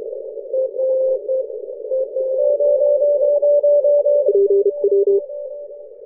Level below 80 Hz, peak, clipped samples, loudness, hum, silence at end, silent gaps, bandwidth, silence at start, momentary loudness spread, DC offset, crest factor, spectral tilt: -70 dBFS; -6 dBFS; under 0.1%; -17 LUFS; none; 0 s; none; 1.1 kHz; 0 s; 15 LU; under 0.1%; 12 dB; -12.5 dB/octave